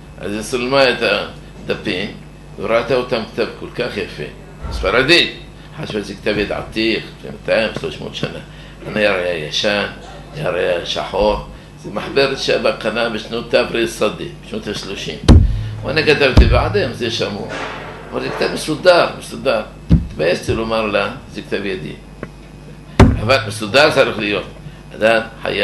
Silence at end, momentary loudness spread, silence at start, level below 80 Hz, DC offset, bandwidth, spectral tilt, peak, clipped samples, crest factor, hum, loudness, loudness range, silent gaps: 0 s; 19 LU; 0 s; -26 dBFS; under 0.1%; 12 kHz; -5.5 dB/octave; 0 dBFS; under 0.1%; 18 dB; none; -17 LUFS; 5 LU; none